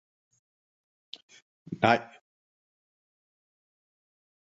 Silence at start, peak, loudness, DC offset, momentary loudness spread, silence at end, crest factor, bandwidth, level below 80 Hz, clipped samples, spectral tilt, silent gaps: 1.7 s; -6 dBFS; -26 LUFS; under 0.1%; 23 LU; 2.55 s; 30 dB; 7.6 kHz; -70 dBFS; under 0.1%; -3.5 dB/octave; none